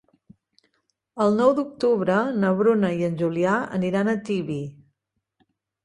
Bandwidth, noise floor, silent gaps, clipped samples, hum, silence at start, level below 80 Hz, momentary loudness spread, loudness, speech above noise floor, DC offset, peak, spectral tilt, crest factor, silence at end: 10.5 kHz; -78 dBFS; none; under 0.1%; none; 1.15 s; -64 dBFS; 8 LU; -22 LUFS; 56 dB; under 0.1%; -6 dBFS; -7.5 dB/octave; 18 dB; 1.15 s